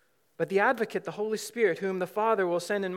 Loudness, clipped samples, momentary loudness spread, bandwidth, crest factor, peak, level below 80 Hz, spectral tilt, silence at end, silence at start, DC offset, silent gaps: -28 LUFS; under 0.1%; 7 LU; 16.5 kHz; 18 dB; -12 dBFS; -90 dBFS; -5 dB/octave; 0 s; 0.4 s; under 0.1%; none